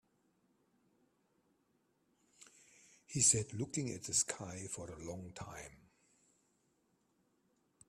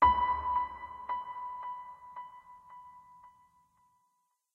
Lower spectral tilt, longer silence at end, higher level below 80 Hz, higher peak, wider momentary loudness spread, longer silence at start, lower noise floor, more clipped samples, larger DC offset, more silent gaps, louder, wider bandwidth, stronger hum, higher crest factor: second, -3 dB/octave vs -6 dB/octave; first, 2.15 s vs 1.25 s; second, -70 dBFS vs -54 dBFS; second, -16 dBFS vs -12 dBFS; second, 20 LU vs 23 LU; first, 2.4 s vs 0 s; about the same, -78 dBFS vs -78 dBFS; neither; neither; neither; about the same, -35 LUFS vs -34 LUFS; first, 14.5 kHz vs 5.2 kHz; neither; first, 28 dB vs 22 dB